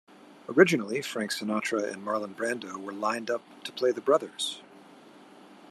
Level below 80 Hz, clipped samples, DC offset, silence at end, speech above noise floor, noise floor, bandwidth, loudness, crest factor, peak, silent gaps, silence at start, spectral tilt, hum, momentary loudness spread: -84 dBFS; under 0.1%; under 0.1%; 0.05 s; 24 dB; -52 dBFS; 14 kHz; -28 LUFS; 24 dB; -6 dBFS; none; 0.3 s; -4 dB/octave; none; 12 LU